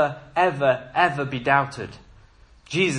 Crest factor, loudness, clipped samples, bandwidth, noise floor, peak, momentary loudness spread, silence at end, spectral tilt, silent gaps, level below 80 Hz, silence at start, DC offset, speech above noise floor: 20 dB; -22 LUFS; under 0.1%; 10.5 kHz; -52 dBFS; -4 dBFS; 10 LU; 0 s; -5 dB/octave; none; -54 dBFS; 0 s; under 0.1%; 29 dB